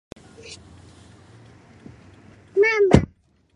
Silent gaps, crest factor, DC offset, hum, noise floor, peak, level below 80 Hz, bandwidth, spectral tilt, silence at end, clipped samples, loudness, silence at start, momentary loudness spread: none; 24 dB; under 0.1%; none; -54 dBFS; 0 dBFS; -38 dBFS; 10.5 kHz; -7 dB/octave; 0.5 s; under 0.1%; -18 LUFS; 0.45 s; 26 LU